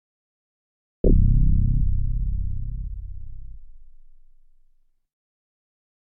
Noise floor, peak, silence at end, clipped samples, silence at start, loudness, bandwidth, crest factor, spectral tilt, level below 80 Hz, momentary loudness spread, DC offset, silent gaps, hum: -59 dBFS; -6 dBFS; 2.3 s; under 0.1%; 1.05 s; -25 LUFS; 0.8 kHz; 18 dB; -15.5 dB/octave; -26 dBFS; 21 LU; under 0.1%; none; none